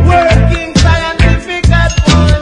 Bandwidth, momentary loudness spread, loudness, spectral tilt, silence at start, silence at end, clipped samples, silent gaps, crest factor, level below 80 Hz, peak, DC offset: 10.5 kHz; 3 LU; -10 LUFS; -5.5 dB/octave; 0 s; 0 s; 0.8%; none; 8 dB; -14 dBFS; 0 dBFS; under 0.1%